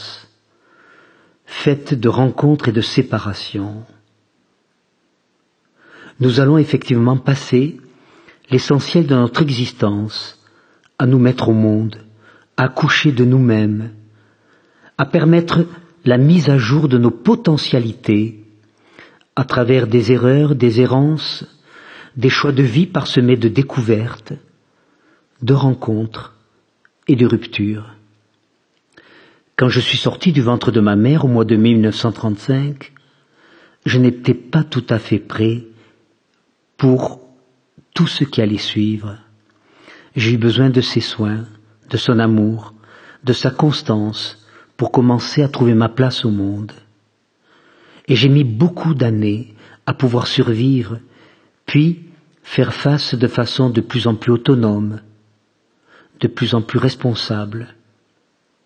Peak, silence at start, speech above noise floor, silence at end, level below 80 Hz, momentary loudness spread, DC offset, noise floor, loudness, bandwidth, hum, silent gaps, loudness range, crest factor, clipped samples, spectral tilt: 0 dBFS; 0 s; 49 dB; 1 s; -56 dBFS; 13 LU; under 0.1%; -63 dBFS; -16 LUFS; 9 kHz; none; none; 5 LU; 16 dB; under 0.1%; -7 dB/octave